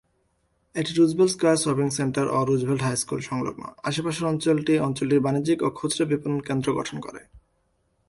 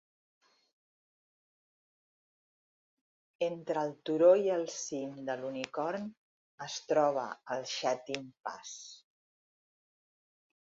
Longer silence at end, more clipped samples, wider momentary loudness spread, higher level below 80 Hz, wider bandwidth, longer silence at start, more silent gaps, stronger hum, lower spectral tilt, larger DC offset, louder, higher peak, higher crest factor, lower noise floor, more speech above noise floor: second, 0.7 s vs 1.65 s; neither; second, 9 LU vs 18 LU; first, -58 dBFS vs -84 dBFS; first, 11.5 kHz vs 7.6 kHz; second, 0.75 s vs 3.4 s; second, none vs 6.17-6.58 s; neither; first, -5.5 dB/octave vs -3.5 dB/octave; neither; first, -24 LUFS vs -33 LUFS; first, -10 dBFS vs -14 dBFS; second, 16 dB vs 22 dB; second, -69 dBFS vs under -90 dBFS; second, 46 dB vs over 57 dB